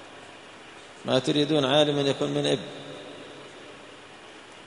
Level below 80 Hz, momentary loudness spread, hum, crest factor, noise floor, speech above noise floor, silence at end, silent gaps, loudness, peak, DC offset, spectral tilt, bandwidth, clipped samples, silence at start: -66 dBFS; 23 LU; none; 22 dB; -46 dBFS; 22 dB; 0 s; none; -24 LUFS; -6 dBFS; under 0.1%; -5 dB/octave; 10.5 kHz; under 0.1%; 0 s